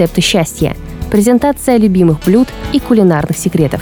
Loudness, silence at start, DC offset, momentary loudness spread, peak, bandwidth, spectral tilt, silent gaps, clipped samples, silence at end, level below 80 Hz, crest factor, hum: -11 LUFS; 0 s; under 0.1%; 7 LU; 0 dBFS; over 20 kHz; -5.5 dB/octave; none; under 0.1%; 0 s; -30 dBFS; 10 dB; none